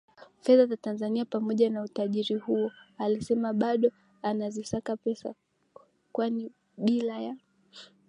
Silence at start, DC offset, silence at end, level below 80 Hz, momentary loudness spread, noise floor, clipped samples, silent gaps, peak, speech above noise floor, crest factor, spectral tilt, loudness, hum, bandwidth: 0.2 s; under 0.1%; 0.25 s; -68 dBFS; 12 LU; -58 dBFS; under 0.1%; none; -10 dBFS; 30 dB; 20 dB; -6.5 dB/octave; -29 LUFS; none; 11 kHz